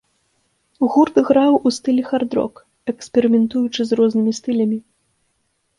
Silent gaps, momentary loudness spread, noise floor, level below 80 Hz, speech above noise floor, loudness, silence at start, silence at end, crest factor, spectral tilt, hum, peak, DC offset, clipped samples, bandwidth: none; 12 LU; -68 dBFS; -60 dBFS; 51 dB; -18 LUFS; 0.8 s; 1 s; 16 dB; -5.5 dB/octave; none; -2 dBFS; under 0.1%; under 0.1%; 11 kHz